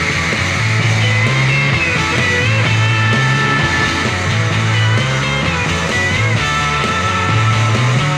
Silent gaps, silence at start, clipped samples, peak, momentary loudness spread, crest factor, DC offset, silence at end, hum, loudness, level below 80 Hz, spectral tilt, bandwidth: none; 0 s; under 0.1%; -2 dBFS; 3 LU; 12 dB; under 0.1%; 0 s; none; -14 LUFS; -34 dBFS; -4.5 dB/octave; 11 kHz